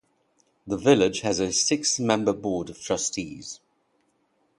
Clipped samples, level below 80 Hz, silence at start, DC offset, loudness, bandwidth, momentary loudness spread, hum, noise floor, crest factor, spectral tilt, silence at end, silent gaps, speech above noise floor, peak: under 0.1%; -58 dBFS; 0.65 s; under 0.1%; -24 LUFS; 11.5 kHz; 15 LU; none; -69 dBFS; 22 dB; -3.5 dB/octave; 1.05 s; none; 45 dB; -4 dBFS